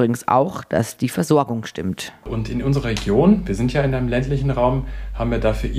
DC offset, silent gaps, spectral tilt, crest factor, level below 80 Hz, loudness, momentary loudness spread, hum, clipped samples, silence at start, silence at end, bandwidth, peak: under 0.1%; none; -6.5 dB/octave; 16 dB; -32 dBFS; -20 LUFS; 10 LU; none; under 0.1%; 0 s; 0 s; 15.5 kHz; -4 dBFS